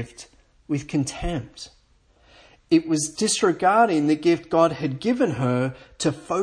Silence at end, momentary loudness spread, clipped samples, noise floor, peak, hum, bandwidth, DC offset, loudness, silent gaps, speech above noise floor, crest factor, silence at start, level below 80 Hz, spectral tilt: 0 s; 11 LU; under 0.1%; -59 dBFS; -4 dBFS; none; 10.5 kHz; under 0.1%; -22 LUFS; none; 37 dB; 18 dB; 0 s; -46 dBFS; -5 dB/octave